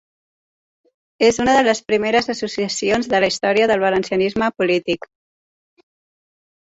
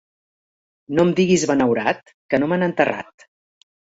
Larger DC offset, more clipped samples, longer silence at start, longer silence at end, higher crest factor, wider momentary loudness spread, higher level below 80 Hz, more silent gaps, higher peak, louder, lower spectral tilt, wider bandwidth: neither; neither; first, 1.2 s vs 0.9 s; first, 1.7 s vs 0.95 s; about the same, 18 dB vs 18 dB; second, 7 LU vs 10 LU; about the same, -52 dBFS vs -56 dBFS; second, none vs 2.14-2.29 s; about the same, -2 dBFS vs -4 dBFS; about the same, -18 LUFS vs -19 LUFS; second, -4 dB/octave vs -5.5 dB/octave; about the same, 8 kHz vs 8 kHz